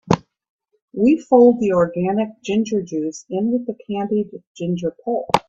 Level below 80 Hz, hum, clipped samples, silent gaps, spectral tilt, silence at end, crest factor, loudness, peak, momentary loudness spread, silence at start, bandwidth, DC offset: -56 dBFS; none; under 0.1%; 0.50-0.59 s, 0.82-0.88 s, 4.47-4.55 s; -7 dB/octave; 0.1 s; 18 dB; -19 LUFS; 0 dBFS; 13 LU; 0.05 s; 9.2 kHz; under 0.1%